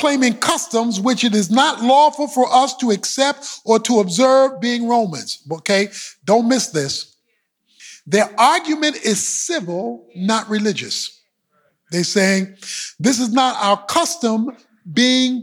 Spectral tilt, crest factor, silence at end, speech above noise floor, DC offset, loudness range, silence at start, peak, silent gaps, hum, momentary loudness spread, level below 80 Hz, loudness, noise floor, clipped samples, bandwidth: -3.5 dB/octave; 16 dB; 0 s; 52 dB; under 0.1%; 5 LU; 0 s; -2 dBFS; none; none; 11 LU; -68 dBFS; -17 LUFS; -69 dBFS; under 0.1%; 16.5 kHz